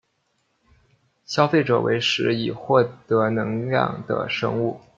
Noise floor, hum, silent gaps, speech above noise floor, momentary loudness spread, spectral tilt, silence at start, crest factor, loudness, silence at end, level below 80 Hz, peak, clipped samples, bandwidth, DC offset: -70 dBFS; none; none; 48 dB; 6 LU; -6 dB/octave; 1.3 s; 20 dB; -22 LUFS; 0.2 s; -62 dBFS; -2 dBFS; under 0.1%; 7.6 kHz; under 0.1%